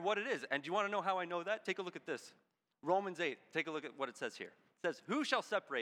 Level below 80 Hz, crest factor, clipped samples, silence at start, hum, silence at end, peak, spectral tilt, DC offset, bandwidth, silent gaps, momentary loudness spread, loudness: under -90 dBFS; 22 dB; under 0.1%; 0 s; none; 0 s; -16 dBFS; -4 dB/octave; under 0.1%; 15 kHz; none; 10 LU; -39 LUFS